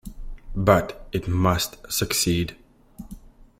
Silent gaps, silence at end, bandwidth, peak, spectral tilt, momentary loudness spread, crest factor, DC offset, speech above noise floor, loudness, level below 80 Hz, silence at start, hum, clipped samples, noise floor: none; 0.3 s; 16.5 kHz; -4 dBFS; -4.5 dB/octave; 23 LU; 22 dB; under 0.1%; 21 dB; -23 LUFS; -40 dBFS; 0.05 s; none; under 0.1%; -44 dBFS